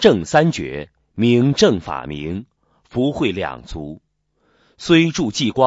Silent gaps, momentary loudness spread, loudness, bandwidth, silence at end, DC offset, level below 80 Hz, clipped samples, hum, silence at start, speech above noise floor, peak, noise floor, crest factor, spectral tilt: none; 17 LU; -18 LUFS; 8 kHz; 0 s; under 0.1%; -44 dBFS; under 0.1%; none; 0 s; 47 dB; 0 dBFS; -64 dBFS; 18 dB; -5.5 dB/octave